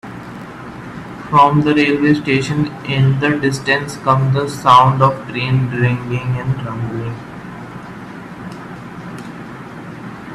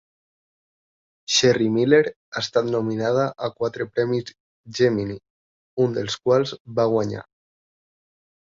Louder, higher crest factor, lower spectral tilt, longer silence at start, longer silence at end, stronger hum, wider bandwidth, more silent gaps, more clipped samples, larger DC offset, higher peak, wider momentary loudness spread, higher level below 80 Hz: first, -15 LUFS vs -22 LUFS; about the same, 16 dB vs 20 dB; first, -6.5 dB/octave vs -4.5 dB/octave; second, 0.05 s vs 1.3 s; second, 0 s vs 1.2 s; neither; first, 12.5 kHz vs 7.8 kHz; second, none vs 2.16-2.32 s, 4.40-4.64 s, 5.30-5.77 s, 6.60-6.65 s; neither; neither; first, 0 dBFS vs -4 dBFS; first, 20 LU vs 15 LU; first, -46 dBFS vs -60 dBFS